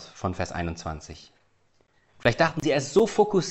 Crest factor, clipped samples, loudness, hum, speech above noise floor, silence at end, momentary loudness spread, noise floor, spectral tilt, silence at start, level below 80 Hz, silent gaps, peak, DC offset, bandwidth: 22 dB; under 0.1%; -25 LUFS; none; 40 dB; 0 s; 16 LU; -65 dBFS; -5 dB/octave; 0 s; -50 dBFS; none; -4 dBFS; under 0.1%; 8.4 kHz